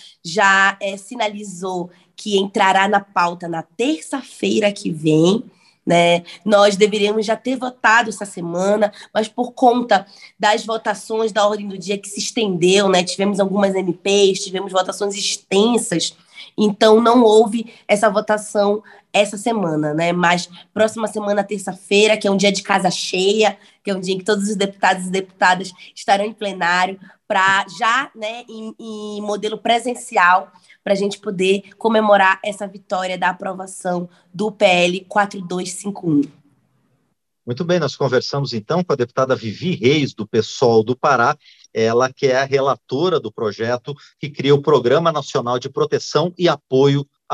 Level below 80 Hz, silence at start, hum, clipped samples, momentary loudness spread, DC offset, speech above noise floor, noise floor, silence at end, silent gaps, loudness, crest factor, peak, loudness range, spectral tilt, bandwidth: -68 dBFS; 0.05 s; none; under 0.1%; 12 LU; under 0.1%; 52 dB; -69 dBFS; 0 s; none; -18 LUFS; 18 dB; 0 dBFS; 4 LU; -4.5 dB/octave; 12.5 kHz